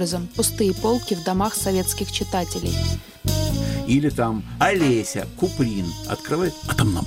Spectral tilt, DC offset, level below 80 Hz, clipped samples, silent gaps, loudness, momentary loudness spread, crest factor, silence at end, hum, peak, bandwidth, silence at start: -5 dB/octave; under 0.1%; -36 dBFS; under 0.1%; none; -22 LUFS; 6 LU; 18 dB; 0 s; none; -4 dBFS; 17 kHz; 0 s